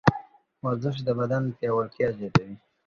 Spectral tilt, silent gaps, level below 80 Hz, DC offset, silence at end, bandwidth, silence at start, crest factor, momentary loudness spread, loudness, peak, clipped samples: -7.5 dB/octave; none; -54 dBFS; under 0.1%; 0.3 s; 7.2 kHz; 0.05 s; 24 dB; 8 LU; -27 LUFS; -2 dBFS; under 0.1%